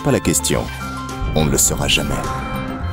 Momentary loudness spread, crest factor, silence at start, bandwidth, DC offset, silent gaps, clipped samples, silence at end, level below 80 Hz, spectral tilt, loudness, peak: 11 LU; 14 dB; 0 s; 19 kHz; under 0.1%; none; under 0.1%; 0 s; -28 dBFS; -3.5 dB/octave; -18 LUFS; -4 dBFS